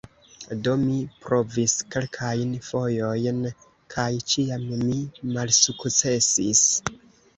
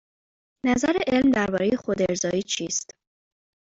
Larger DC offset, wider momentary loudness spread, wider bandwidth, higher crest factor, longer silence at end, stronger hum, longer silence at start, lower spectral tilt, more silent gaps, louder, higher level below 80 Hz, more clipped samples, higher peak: neither; first, 12 LU vs 8 LU; about the same, 8.4 kHz vs 8 kHz; about the same, 22 dB vs 18 dB; second, 0.4 s vs 0.9 s; neither; second, 0.4 s vs 0.65 s; about the same, -3.5 dB/octave vs -4 dB/octave; neither; about the same, -23 LUFS vs -24 LUFS; about the same, -56 dBFS vs -54 dBFS; neither; first, -2 dBFS vs -8 dBFS